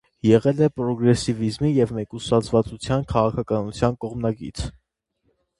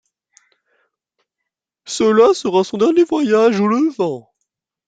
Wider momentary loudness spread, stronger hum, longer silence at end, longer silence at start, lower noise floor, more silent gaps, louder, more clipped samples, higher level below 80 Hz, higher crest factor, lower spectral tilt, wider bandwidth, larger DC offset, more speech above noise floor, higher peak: about the same, 10 LU vs 10 LU; neither; first, 0.9 s vs 0.65 s; second, 0.25 s vs 1.85 s; second, -71 dBFS vs -81 dBFS; neither; second, -22 LUFS vs -15 LUFS; neither; first, -42 dBFS vs -62 dBFS; about the same, 20 dB vs 16 dB; first, -7 dB/octave vs -5.5 dB/octave; first, 11.5 kHz vs 9.2 kHz; neither; second, 50 dB vs 66 dB; about the same, -2 dBFS vs -2 dBFS